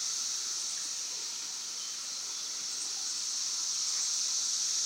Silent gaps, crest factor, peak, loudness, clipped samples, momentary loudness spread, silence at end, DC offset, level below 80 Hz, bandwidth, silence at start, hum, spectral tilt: none; 16 dB; -20 dBFS; -32 LUFS; under 0.1%; 7 LU; 0 s; under 0.1%; under -90 dBFS; 16 kHz; 0 s; none; 3.5 dB/octave